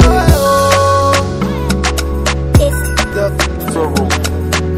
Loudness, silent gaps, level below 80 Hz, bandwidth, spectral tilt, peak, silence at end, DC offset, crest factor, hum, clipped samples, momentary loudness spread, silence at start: -13 LUFS; none; -18 dBFS; 16.5 kHz; -5 dB/octave; 0 dBFS; 0 s; under 0.1%; 12 dB; none; 0.5%; 6 LU; 0 s